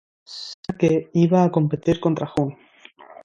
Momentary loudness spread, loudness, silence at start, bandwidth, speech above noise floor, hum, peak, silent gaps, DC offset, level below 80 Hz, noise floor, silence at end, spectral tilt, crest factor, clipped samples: 16 LU; -21 LUFS; 0.3 s; 7.8 kHz; 28 dB; none; -4 dBFS; 0.54-0.63 s; under 0.1%; -52 dBFS; -47 dBFS; 0.1 s; -8 dB/octave; 18 dB; under 0.1%